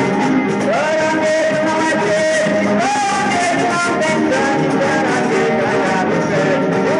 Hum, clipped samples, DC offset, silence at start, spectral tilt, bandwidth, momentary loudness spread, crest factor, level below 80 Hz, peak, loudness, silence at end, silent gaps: none; under 0.1%; under 0.1%; 0 s; -5 dB/octave; 11.5 kHz; 1 LU; 12 dB; -54 dBFS; -2 dBFS; -15 LUFS; 0 s; none